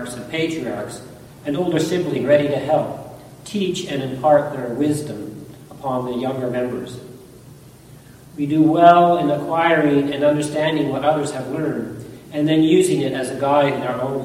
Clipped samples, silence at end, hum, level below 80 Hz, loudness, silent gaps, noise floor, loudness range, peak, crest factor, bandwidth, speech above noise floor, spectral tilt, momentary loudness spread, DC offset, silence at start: under 0.1%; 0 s; none; -54 dBFS; -19 LUFS; none; -43 dBFS; 9 LU; 0 dBFS; 20 dB; 15.5 kHz; 25 dB; -6 dB/octave; 17 LU; under 0.1%; 0 s